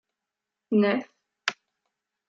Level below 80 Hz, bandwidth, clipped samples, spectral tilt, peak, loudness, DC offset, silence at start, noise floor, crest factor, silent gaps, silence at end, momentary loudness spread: -80 dBFS; 7.6 kHz; under 0.1%; -5.5 dB/octave; -8 dBFS; -27 LUFS; under 0.1%; 0.7 s; -87 dBFS; 22 dB; none; 0.75 s; 9 LU